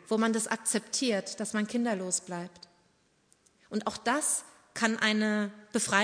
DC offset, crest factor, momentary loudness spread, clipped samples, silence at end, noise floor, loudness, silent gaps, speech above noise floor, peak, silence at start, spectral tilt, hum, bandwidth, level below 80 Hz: under 0.1%; 22 dB; 9 LU; under 0.1%; 0 s; -69 dBFS; -30 LUFS; none; 39 dB; -10 dBFS; 0.05 s; -3 dB/octave; none; 11 kHz; -74 dBFS